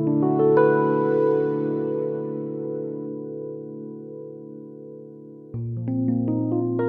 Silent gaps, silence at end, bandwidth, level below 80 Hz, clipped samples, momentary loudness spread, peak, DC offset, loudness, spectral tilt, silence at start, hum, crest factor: none; 0 s; 4.2 kHz; -64 dBFS; under 0.1%; 21 LU; -6 dBFS; under 0.1%; -23 LUFS; -12 dB/octave; 0 s; none; 16 dB